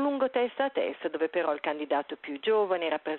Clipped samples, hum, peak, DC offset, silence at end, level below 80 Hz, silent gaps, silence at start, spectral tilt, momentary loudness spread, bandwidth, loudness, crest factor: under 0.1%; none; -14 dBFS; under 0.1%; 0 s; -78 dBFS; none; 0 s; -1 dB/octave; 5 LU; 4.2 kHz; -29 LUFS; 14 dB